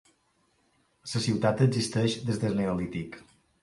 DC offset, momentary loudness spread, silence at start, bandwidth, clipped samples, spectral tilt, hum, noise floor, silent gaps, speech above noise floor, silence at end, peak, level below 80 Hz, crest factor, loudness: under 0.1%; 16 LU; 1.05 s; 11.5 kHz; under 0.1%; -6 dB/octave; none; -70 dBFS; none; 43 dB; 0.4 s; -10 dBFS; -56 dBFS; 20 dB; -28 LUFS